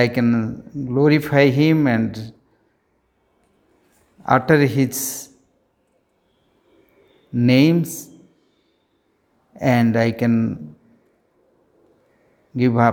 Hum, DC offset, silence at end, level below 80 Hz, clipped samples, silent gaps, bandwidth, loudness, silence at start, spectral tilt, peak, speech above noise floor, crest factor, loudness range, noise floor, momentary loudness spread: none; under 0.1%; 0 s; -58 dBFS; under 0.1%; none; 18 kHz; -18 LUFS; 0 s; -6.5 dB/octave; 0 dBFS; 48 dB; 20 dB; 3 LU; -65 dBFS; 18 LU